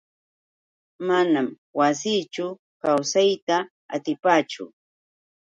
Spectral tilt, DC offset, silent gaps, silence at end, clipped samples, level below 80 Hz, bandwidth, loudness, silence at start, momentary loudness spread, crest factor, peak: -4 dB/octave; under 0.1%; 1.58-1.74 s, 2.59-2.80 s, 3.42-3.47 s, 3.71-3.89 s; 0.75 s; under 0.1%; -76 dBFS; 10.5 kHz; -23 LUFS; 1 s; 12 LU; 20 dB; -4 dBFS